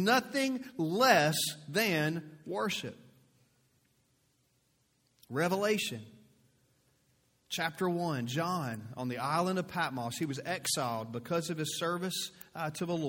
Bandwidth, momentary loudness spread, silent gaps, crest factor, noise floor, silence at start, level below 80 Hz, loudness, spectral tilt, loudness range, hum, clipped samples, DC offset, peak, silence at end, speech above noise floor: 17 kHz; 11 LU; none; 24 dB; -74 dBFS; 0 s; -74 dBFS; -33 LUFS; -4 dB/octave; 6 LU; none; under 0.1%; under 0.1%; -10 dBFS; 0 s; 41 dB